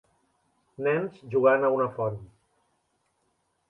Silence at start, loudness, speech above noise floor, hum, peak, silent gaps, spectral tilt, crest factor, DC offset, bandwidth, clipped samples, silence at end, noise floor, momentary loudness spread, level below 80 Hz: 0.8 s; -26 LUFS; 48 dB; none; -8 dBFS; none; -9 dB/octave; 20 dB; under 0.1%; 4.1 kHz; under 0.1%; 1.45 s; -74 dBFS; 11 LU; -66 dBFS